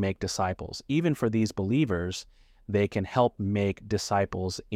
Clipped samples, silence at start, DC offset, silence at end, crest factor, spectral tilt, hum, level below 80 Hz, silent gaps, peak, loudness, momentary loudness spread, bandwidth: under 0.1%; 0 s; under 0.1%; 0 s; 18 dB; -6 dB/octave; none; -52 dBFS; none; -10 dBFS; -28 LUFS; 5 LU; 15.5 kHz